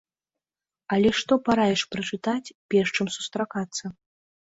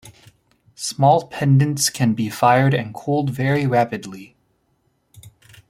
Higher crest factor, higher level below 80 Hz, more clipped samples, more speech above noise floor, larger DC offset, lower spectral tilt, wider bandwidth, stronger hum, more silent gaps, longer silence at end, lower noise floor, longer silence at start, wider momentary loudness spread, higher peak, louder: about the same, 18 dB vs 18 dB; about the same, -58 dBFS vs -58 dBFS; neither; first, over 65 dB vs 48 dB; neither; about the same, -4.5 dB/octave vs -5.5 dB/octave; second, 8 kHz vs 16 kHz; neither; first, 2.55-2.69 s vs none; about the same, 0.5 s vs 0.4 s; first, under -90 dBFS vs -66 dBFS; first, 0.9 s vs 0.05 s; about the same, 10 LU vs 12 LU; second, -8 dBFS vs -2 dBFS; second, -25 LUFS vs -18 LUFS